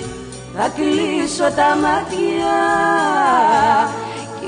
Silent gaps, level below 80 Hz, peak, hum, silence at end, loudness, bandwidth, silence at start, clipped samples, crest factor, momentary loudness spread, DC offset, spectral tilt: none; -46 dBFS; -2 dBFS; none; 0 s; -16 LUFS; 10 kHz; 0 s; under 0.1%; 14 dB; 13 LU; under 0.1%; -4 dB/octave